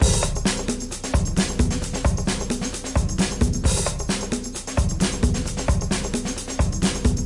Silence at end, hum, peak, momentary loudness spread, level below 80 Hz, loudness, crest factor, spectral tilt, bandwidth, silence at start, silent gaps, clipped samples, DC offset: 0 s; none; -6 dBFS; 5 LU; -26 dBFS; -24 LUFS; 16 dB; -4.5 dB/octave; 11.5 kHz; 0 s; none; under 0.1%; under 0.1%